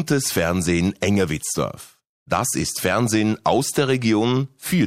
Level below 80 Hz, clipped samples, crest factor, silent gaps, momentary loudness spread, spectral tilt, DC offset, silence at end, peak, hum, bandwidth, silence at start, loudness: -48 dBFS; under 0.1%; 16 dB; 2.09-2.26 s; 5 LU; -4.5 dB/octave; under 0.1%; 0 s; -6 dBFS; none; 16 kHz; 0 s; -21 LUFS